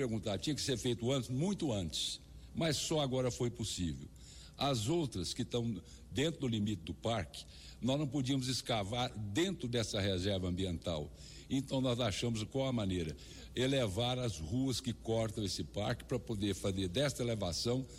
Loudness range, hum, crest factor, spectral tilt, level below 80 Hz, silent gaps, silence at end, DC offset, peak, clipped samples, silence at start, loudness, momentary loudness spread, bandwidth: 2 LU; none; 12 dB; -5 dB/octave; -56 dBFS; none; 0 s; under 0.1%; -24 dBFS; under 0.1%; 0 s; -37 LUFS; 7 LU; 16 kHz